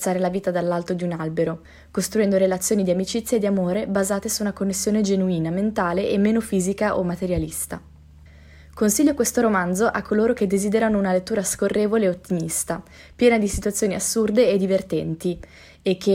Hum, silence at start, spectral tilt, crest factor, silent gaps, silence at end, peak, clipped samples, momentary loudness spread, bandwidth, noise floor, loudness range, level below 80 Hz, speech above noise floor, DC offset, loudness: none; 0 s; -5 dB/octave; 16 dB; none; 0 s; -4 dBFS; under 0.1%; 8 LU; 16 kHz; -47 dBFS; 2 LU; -46 dBFS; 25 dB; under 0.1%; -22 LUFS